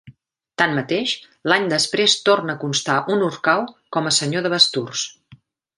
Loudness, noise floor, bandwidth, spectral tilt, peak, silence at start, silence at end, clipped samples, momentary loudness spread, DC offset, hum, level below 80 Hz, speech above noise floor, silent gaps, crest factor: -19 LUFS; -51 dBFS; 11.5 kHz; -3 dB/octave; -2 dBFS; 0.05 s; 0.45 s; under 0.1%; 10 LU; under 0.1%; none; -66 dBFS; 31 dB; none; 20 dB